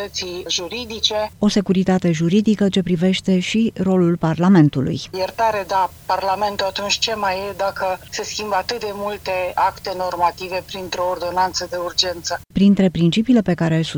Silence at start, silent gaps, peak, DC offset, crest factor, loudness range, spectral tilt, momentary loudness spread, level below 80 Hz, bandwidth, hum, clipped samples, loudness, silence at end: 0 s; none; 0 dBFS; under 0.1%; 18 dB; 5 LU; -5.5 dB/octave; 9 LU; -48 dBFS; over 20 kHz; none; under 0.1%; -19 LUFS; 0 s